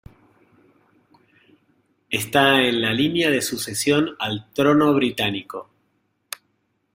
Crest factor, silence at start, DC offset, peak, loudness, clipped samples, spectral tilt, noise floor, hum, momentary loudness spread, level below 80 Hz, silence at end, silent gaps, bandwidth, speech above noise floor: 22 dB; 2.1 s; under 0.1%; -2 dBFS; -20 LUFS; under 0.1%; -4 dB/octave; -70 dBFS; none; 20 LU; -60 dBFS; 1.35 s; none; 16 kHz; 50 dB